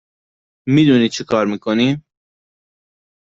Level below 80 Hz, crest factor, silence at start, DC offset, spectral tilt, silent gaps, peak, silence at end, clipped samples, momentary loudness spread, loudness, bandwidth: -56 dBFS; 16 dB; 0.65 s; under 0.1%; -6 dB/octave; none; -2 dBFS; 1.2 s; under 0.1%; 9 LU; -16 LUFS; 7.8 kHz